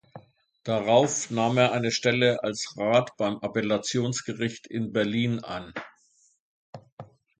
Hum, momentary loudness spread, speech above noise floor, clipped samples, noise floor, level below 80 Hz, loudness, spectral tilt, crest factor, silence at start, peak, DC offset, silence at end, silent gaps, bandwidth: none; 12 LU; 38 dB; under 0.1%; -64 dBFS; -64 dBFS; -26 LUFS; -4.5 dB/octave; 20 dB; 0.15 s; -6 dBFS; under 0.1%; 0.35 s; 6.40-6.73 s, 6.92-6.97 s; 9.6 kHz